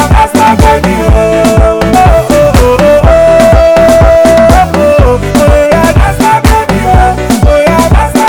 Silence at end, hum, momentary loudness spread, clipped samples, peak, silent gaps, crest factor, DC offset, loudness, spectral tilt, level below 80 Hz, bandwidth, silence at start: 0 s; none; 4 LU; 20%; 0 dBFS; none; 4 dB; under 0.1%; -5 LUFS; -6 dB/octave; -12 dBFS; 19.5 kHz; 0 s